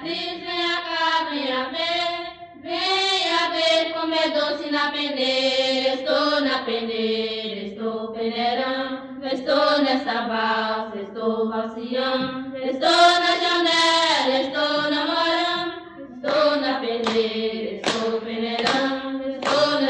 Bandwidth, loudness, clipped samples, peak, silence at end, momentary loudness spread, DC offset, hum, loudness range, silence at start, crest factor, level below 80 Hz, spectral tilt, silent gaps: 10 kHz; -22 LUFS; under 0.1%; -4 dBFS; 0 s; 10 LU; under 0.1%; none; 5 LU; 0 s; 18 dB; -64 dBFS; -3 dB/octave; none